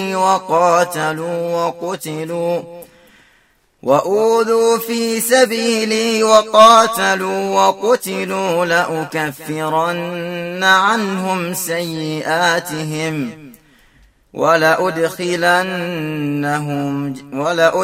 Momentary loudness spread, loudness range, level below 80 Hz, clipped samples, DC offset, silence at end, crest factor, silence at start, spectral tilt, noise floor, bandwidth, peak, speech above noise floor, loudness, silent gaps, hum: 11 LU; 7 LU; -60 dBFS; under 0.1%; under 0.1%; 0 s; 16 dB; 0 s; -4 dB/octave; -56 dBFS; 16 kHz; 0 dBFS; 41 dB; -16 LUFS; none; none